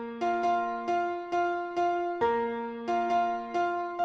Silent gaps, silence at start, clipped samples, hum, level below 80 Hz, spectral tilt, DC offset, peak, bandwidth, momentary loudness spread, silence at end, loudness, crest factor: none; 0 s; under 0.1%; none; -68 dBFS; -5 dB/octave; under 0.1%; -16 dBFS; 7.4 kHz; 3 LU; 0 s; -30 LUFS; 14 dB